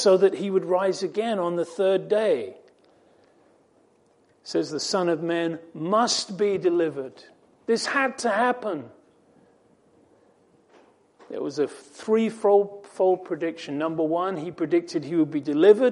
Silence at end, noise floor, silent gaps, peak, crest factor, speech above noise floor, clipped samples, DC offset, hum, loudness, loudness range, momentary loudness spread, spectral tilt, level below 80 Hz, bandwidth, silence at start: 0 s; -62 dBFS; none; -4 dBFS; 20 dB; 38 dB; under 0.1%; under 0.1%; none; -24 LUFS; 6 LU; 11 LU; -4.5 dB/octave; -78 dBFS; 11 kHz; 0 s